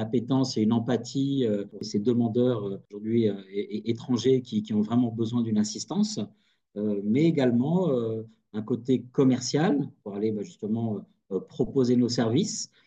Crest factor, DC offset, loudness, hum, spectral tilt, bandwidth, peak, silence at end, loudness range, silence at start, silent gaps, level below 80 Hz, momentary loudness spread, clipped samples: 16 dB; under 0.1%; -27 LUFS; none; -6.5 dB/octave; 8.6 kHz; -10 dBFS; 0.2 s; 2 LU; 0 s; none; -64 dBFS; 11 LU; under 0.1%